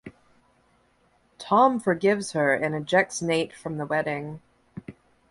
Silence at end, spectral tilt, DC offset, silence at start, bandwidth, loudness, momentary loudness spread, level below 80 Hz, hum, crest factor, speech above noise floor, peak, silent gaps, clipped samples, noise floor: 0.4 s; -5 dB/octave; under 0.1%; 0.05 s; 11.5 kHz; -24 LUFS; 23 LU; -64 dBFS; none; 20 dB; 41 dB; -6 dBFS; none; under 0.1%; -64 dBFS